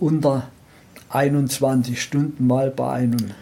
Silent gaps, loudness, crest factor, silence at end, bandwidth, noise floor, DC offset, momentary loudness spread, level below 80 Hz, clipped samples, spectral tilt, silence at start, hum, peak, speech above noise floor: none; -21 LUFS; 14 dB; 0 s; 17 kHz; -47 dBFS; under 0.1%; 5 LU; -58 dBFS; under 0.1%; -6.5 dB/octave; 0 s; none; -6 dBFS; 27 dB